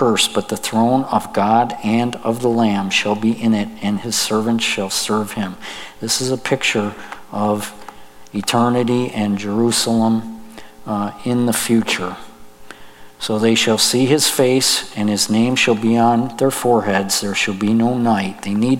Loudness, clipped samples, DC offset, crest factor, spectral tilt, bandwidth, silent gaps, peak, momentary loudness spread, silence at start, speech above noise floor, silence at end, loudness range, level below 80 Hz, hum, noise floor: -17 LUFS; under 0.1%; under 0.1%; 16 dB; -4 dB/octave; 16.5 kHz; none; 0 dBFS; 10 LU; 0 s; 21 dB; 0 s; 5 LU; -54 dBFS; none; -38 dBFS